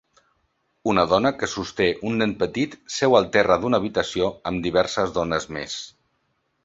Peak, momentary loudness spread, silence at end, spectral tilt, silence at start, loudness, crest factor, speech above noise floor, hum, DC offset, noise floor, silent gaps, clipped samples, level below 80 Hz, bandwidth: -2 dBFS; 11 LU; 0.75 s; -4.5 dB/octave; 0.85 s; -22 LUFS; 20 dB; 49 dB; none; under 0.1%; -71 dBFS; none; under 0.1%; -50 dBFS; 8 kHz